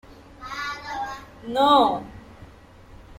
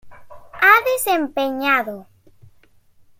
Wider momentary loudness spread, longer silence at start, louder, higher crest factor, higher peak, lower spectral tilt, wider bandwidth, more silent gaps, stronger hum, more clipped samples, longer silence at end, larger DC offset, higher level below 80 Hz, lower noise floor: first, 25 LU vs 13 LU; about the same, 0.1 s vs 0.05 s; second, -23 LUFS vs -17 LUFS; about the same, 20 dB vs 18 dB; second, -6 dBFS vs -2 dBFS; first, -4.5 dB/octave vs -2 dB/octave; about the same, 16.5 kHz vs 17 kHz; neither; neither; neither; second, 0.05 s vs 1.15 s; neither; first, -52 dBFS vs -58 dBFS; second, -47 dBFS vs -54 dBFS